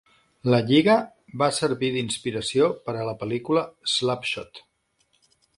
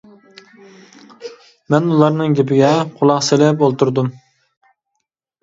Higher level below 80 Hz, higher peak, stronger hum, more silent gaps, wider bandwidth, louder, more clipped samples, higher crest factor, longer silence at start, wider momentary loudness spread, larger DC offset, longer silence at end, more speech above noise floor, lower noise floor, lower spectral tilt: about the same, -62 dBFS vs -62 dBFS; second, -6 dBFS vs 0 dBFS; neither; neither; first, 11.5 kHz vs 7.8 kHz; second, -24 LUFS vs -15 LUFS; neither; about the same, 20 dB vs 16 dB; second, 0.45 s vs 1.2 s; second, 11 LU vs 22 LU; neither; second, 1 s vs 1.3 s; second, 45 dB vs 61 dB; second, -69 dBFS vs -75 dBFS; about the same, -5 dB/octave vs -6 dB/octave